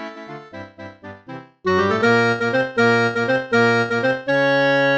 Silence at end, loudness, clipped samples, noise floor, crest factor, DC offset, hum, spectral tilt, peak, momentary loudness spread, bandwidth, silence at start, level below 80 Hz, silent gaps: 0 s; -18 LUFS; under 0.1%; -38 dBFS; 14 dB; under 0.1%; none; -6 dB/octave; -4 dBFS; 21 LU; 8.4 kHz; 0 s; -62 dBFS; none